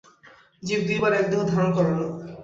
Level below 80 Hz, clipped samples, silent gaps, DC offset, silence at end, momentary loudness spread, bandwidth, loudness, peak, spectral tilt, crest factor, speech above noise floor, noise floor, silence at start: -58 dBFS; under 0.1%; none; under 0.1%; 0 s; 8 LU; 7.8 kHz; -23 LUFS; -8 dBFS; -6.5 dB/octave; 16 dB; 31 dB; -53 dBFS; 0.6 s